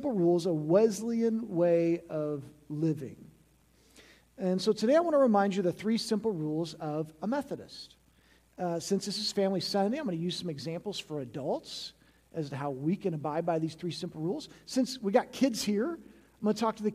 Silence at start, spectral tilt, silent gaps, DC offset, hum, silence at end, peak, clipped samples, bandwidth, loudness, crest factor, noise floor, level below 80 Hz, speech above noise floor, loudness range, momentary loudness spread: 0 s; -5.5 dB/octave; none; under 0.1%; none; 0 s; -12 dBFS; under 0.1%; 15 kHz; -31 LUFS; 20 dB; -64 dBFS; -70 dBFS; 34 dB; 6 LU; 13 LU